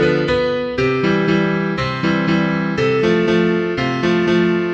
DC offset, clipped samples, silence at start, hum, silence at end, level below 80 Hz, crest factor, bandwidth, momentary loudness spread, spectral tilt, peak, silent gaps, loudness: under 0.1%; under 0.1%; 0 s; none; 0 s; -42 dBFS; 12 dB; 8 kHz; 4 LU; -7 dB/octave; -4 dBFS; none; -17 LUFS